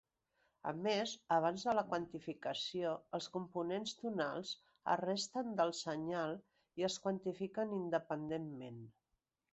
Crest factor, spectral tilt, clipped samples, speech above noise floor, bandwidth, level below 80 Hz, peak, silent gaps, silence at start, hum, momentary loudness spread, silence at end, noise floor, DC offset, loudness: 20 dB; -3.5 dB/octave; under 0.1%; 47 dB; 8 kHz; -80 dBFS; -20 dBFS; none; 0.65 s; none; 10 LU; 0.6 s; -87 dBFS; under 0.1%; -40 LUFS